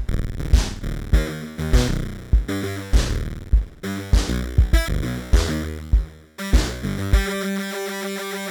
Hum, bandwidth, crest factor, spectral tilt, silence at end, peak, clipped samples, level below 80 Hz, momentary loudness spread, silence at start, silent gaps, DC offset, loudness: none; 19 kHz; 18 dB; -5.5 dB/octave; 0 s; -2 dBFS; under 0.1%; -22 dBFS; 8 LU; 0 s; none; under 0.1%; -23 LUFS